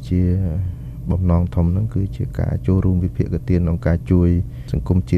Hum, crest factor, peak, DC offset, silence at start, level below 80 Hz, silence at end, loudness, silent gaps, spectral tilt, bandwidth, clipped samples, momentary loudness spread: none; 14 dB; -4 dBFS; under 0.1%; 0 s; -28 dBFS; 0 s; -20 LUFS; none; -10 dB/octave; 4.8 kHz; under 0.1%; 8 LU